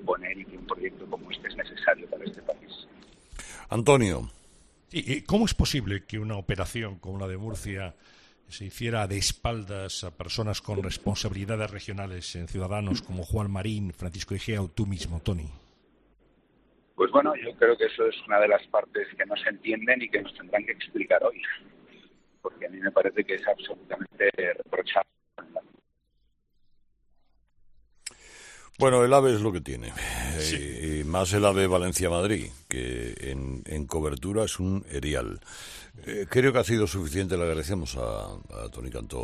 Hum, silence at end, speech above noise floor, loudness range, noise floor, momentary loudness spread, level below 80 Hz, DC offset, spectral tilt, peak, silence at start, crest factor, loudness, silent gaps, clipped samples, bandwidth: none; 0 s; 42 dB; 7 LU; -70 dBFS; 17 LU; -44 dBFS; under 0.1%; -5 dB/octave; -4 dBFS; 0 s; 24 dB; -28 LUFS; none; under 0.1%; 13.5 kHz